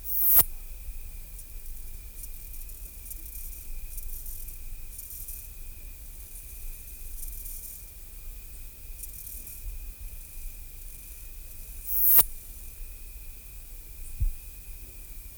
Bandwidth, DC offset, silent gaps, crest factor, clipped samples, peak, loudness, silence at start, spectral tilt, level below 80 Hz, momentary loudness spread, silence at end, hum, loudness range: over 20 kHz; under 0.1%; none; 24 dB; under 0.1%; -8 dBFS; -25 LUFS; 0 s; -2 dB/octave; -40 dBFS; 23 LU; 0 s; none; 16 LU